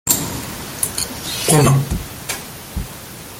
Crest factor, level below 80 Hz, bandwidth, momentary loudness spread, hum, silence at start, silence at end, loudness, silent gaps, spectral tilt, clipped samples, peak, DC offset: 20 dB; -34 dBFS; 17 kHz; 16 LU; none; 0.05 s; 0 s; -19 LUFS; none; -4 dB/octave; under 0.1%; 0 dBFS; under 0.1%